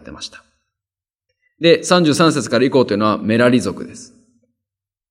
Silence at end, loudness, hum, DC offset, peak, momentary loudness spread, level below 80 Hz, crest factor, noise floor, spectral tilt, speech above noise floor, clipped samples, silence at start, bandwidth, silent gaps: 1.05 s; -15 LUFS; none; under 0.1%; 0 dBFS; 19 LU; -58 dBFS; 18 dB; -89 dBFS; -5 dB/octave; 74 dB; under 0.1%; 0.05 s; 15.5 kHz; none